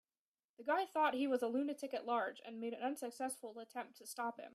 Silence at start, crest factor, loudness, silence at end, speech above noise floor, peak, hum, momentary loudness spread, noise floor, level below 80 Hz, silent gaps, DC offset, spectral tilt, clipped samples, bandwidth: 0.6 s; 18 dB; -41 LUFS; 0.05 s; over 50 dB; -24 dBFS; none; 13 LU; under -90 dBFS; under -90 dBFS; none; under 0.1%; -3 dB/octave; under 0.1%; 15 kHz